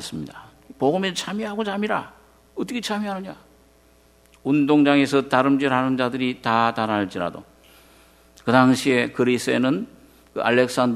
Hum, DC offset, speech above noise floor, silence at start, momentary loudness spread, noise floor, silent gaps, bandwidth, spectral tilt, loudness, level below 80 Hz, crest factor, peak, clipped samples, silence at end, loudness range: none; under 0.1%; 35 dB; 0 s; 15 LU; -55 dBFS; none; 14 kHz; -5.5 dB/octave; -21 LUFS; -60 dBFS; 22 dB; 0 dBFS; under 0.1%; 0 s; 7 LU